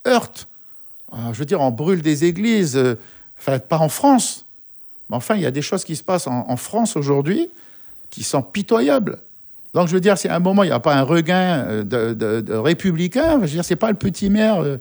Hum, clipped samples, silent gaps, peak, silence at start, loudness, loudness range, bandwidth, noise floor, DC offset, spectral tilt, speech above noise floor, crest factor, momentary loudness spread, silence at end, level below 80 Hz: none; under 0.1%; none; -2 dBFS; 0 s; -19 LUFS; 4 LU; over 20 kHz; -41 dBFS; under 0.1%; -5.5 dB/octave; 23 dB; 16 dB; 20 LU; 0 s; -50 dBFS